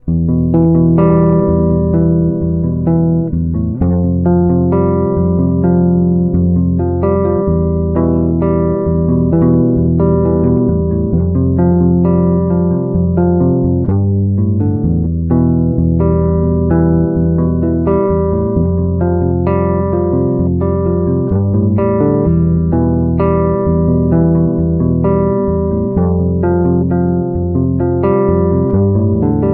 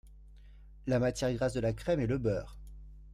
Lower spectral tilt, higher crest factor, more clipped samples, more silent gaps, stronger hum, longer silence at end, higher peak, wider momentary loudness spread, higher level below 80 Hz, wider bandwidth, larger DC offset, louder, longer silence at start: first, -15 dB/octave vs -6.5 dB/octave; about the same, 12 dB vs 16 dB; neither; neither; neither; about the same, 0 s vs 0 s; first, 0 dBFS vs -18 dBFS; second, 3 LU vs 21 LU; first, -26 dBFS vs -48 dBFS; second, 2.9 kHz vs 14 kHz; neither; first, -13 LUFS vs -33 LUFS; about the same, 0.05 s vs 0.05 s